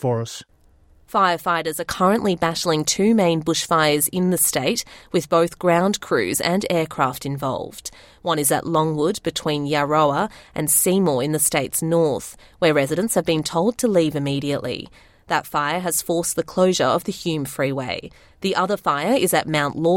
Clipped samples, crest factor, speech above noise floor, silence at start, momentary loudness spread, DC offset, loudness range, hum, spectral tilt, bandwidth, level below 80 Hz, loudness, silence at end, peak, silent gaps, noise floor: under 0.1%; 16 dB; 33 dB; 0 s; 8 LU; under 0.1%; 3 LU; none; -4 dB/octave; 17 kHz; -54 dBFS; -20 LUFS; 0 s; -4 dBFS; none; -53 dBFS